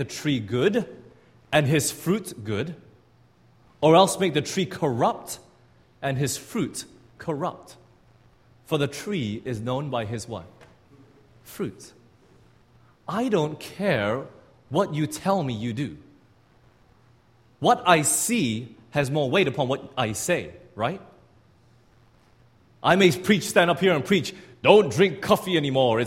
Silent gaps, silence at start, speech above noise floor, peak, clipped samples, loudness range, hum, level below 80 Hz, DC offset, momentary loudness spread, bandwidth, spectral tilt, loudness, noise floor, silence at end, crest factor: none; 0 s; 35 dB; 0 dBFS; under 0.1%; 10 LU; none; -60 dBFS; under 0.1%; 15 LU; 16 kHz; -4.5 dB/octave; -24 LUFS; -59 dBFS; 0 s; 26 dB